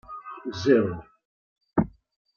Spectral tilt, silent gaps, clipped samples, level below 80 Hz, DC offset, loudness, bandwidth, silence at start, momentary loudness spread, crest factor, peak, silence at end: -7 dB/octave; 1.25-1.56 s; under 0.1%; -54 dBFS; under 0.1%; -26 LUFS; 7 kHz; 0.1 s; 17 LU; 20 dB; -8 dBFS; 0.45 s